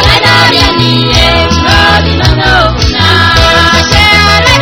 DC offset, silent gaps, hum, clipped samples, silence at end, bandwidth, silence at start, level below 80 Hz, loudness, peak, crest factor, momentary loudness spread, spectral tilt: under 0.1%; none; none; 6%; 0 s; over 20 kHz; 0 s; -16 dBFS; -5 LUFS; 0 dBFS; 6 dB; 3 LU; -4 dB/octave